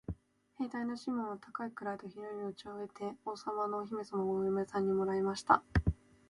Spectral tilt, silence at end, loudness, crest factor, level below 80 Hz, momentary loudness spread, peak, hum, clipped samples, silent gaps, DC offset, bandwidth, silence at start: -7 dB/octave; 0.35 s; -36 LUFS; 24 dB; -50 dBFS; 13 LU; -12 dBFS; none; under 0.1%; none; under 0.1%; 11.5 kHz; 0.1 s